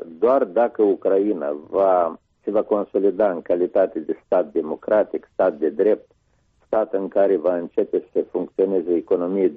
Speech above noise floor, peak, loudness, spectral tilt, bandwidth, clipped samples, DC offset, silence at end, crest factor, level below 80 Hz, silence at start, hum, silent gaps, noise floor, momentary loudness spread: 42 dB; -6 dBFS; -21 LUFS; -7 dB/octave; 4.6 kHz; under 0.1%; under 0.1%; 0 s; 14 dB; -64 dBFS; 0 s; none; none; -63 dBFS; 7 LU